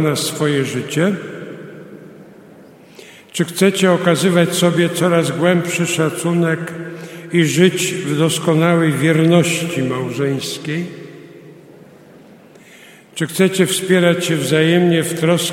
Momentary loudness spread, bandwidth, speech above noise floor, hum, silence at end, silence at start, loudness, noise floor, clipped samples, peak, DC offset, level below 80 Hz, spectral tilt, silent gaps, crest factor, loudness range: 16 LU; 16.5 kHz; 28 dB; none; 0 s; 0 s; -16 LUFS; -43 dBFS; under 0.1%; 0 dBFS; under 0.1%; -62 dBFS; -5 dB/octave; none; 16 dB; 8 LU